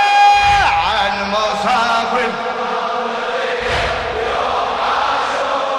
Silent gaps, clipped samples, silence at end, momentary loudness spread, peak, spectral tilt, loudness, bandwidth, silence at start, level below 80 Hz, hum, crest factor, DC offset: none; under 0.1%; 0 s; 9 LU; 0 dBFS; -3 dB/octave; -16 LUFS; 12 kHz; 0 s; -38 dBFS; none; 16 dB; under 0.1%